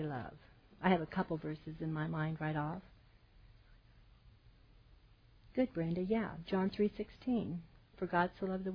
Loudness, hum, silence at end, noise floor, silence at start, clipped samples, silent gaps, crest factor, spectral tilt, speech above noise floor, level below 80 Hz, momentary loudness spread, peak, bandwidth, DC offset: -38 LUFS; none; 0 s; -64 dBFS; 0 s; under 0.1%; none; 24 dB; -6.5 dB/octave; 27 dB; -62 dBFS; 10 LU; -16 dBFS; 5.2 kHz; under 0.1%